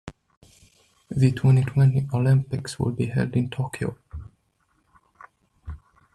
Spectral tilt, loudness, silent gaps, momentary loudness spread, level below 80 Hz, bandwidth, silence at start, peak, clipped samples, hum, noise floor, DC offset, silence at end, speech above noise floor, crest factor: -7.5 dB/octave; -23 LUFS; 0.37-0.41 s; 22 LU; -50 dBFS; 11.5 kHz; 0.05 s; -6 dBFS; under 0.1%; none; -68 dBFS; under 0.1%; 0.4 s; 47 dB; 18 dB